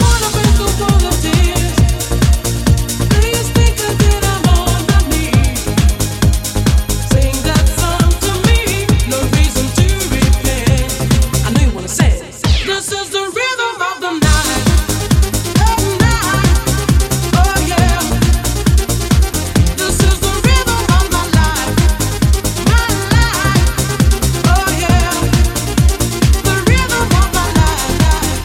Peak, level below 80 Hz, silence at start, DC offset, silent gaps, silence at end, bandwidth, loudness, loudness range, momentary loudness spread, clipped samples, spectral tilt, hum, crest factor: 0 dBFS; -16 dBFS; 0 s; under 0.1%; none; 0 s; 17 kHz; -13 LUFS; 1 LU; 2 LU; under 0.1%; -4.5 dB/octave; none; 12 dB